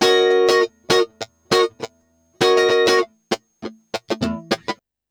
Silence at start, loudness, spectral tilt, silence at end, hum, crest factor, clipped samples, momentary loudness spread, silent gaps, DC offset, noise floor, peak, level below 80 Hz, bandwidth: 0 s; -18 LUFS; -3.5 dB/octave; 0.35 s; none; 20 dB; under 0.1%; 19 LU; none; under 0.1%; -60 dBFS; 0 dBFS; -54 dBFS; over 20 kHz